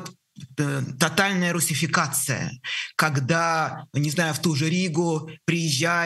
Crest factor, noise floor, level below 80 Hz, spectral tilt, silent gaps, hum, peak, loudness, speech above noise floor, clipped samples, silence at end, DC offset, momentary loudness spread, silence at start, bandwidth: 20 dB; -45 dBFS; -66 dBFS; -4 dB/octave; none; none; -4 dBFS; -23 LUFS; 21 dB; under 0.1%; 0 s; under 0.1%; 7 LU; 0 s; 13 kHz